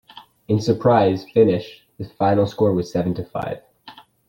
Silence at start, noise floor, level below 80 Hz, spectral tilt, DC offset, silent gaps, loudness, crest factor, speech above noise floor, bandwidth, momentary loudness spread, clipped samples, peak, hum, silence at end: 0.15 s; -46 dBFS; -54 dBFS; -8 dB/octave; under 0.1%; none; -20 LUFS; 18 dB; 27 dB; 16.5 kHz; 17 LU; under 0.1%; -4 dBFS; none; 0.35 s